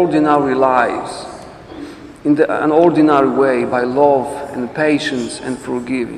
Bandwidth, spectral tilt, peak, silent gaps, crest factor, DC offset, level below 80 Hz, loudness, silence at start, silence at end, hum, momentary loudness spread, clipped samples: 11 kHz; -6 dB/octave; 0 dBFS; none; 14 dB; under 0.1%; -50 dBFS; -15 LUFS; 0 s; 0 s; none; 20 LU; under 0.1%